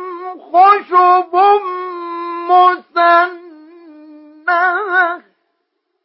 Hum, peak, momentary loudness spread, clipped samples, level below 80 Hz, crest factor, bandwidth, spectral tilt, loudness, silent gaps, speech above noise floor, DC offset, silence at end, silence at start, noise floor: none; 0 dBFS; 14 LU; under 0.1%; -80 dBFS; 14 dB; 5.8 kHz; -6.5 dB/octave; -13 LUFS; none; 59 dB; under 0.1%; 0.85 s; 0 s; -70 dBFS